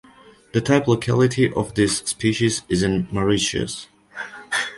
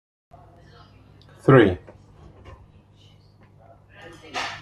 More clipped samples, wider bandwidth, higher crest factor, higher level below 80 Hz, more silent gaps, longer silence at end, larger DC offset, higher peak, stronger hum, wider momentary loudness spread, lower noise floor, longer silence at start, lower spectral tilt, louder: neither; about the same, 11.5 kHz vs 10.5 kHz; second, 18 dB vs 24 dB; first, -46 dBFS vs -54 dBFS; neither; about the same, 0 s vs 0.05 s; neither; about the same, -4 dBFS vs -2 dBFS; second, none vs 50 Hz at -50 dBFS; second, 15 LU vs 27 LU; second, -49 dBFS vs -53 dBFS; second, 0.55 s vs 1.45 s; second, -4.5 dB/octave vs -7.5 dB/octave; about the same, -21 LUFS vs -20 LUFS